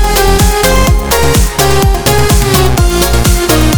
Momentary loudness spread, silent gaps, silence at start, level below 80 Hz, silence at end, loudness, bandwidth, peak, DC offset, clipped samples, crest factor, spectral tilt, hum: 1 LU; none; 0 s; -12 dBFS; 0 s; -9 LUFS; over 20 kHz; 0 dBFS; 6%; 0.3%; 8 dB; -4 dB/octave; none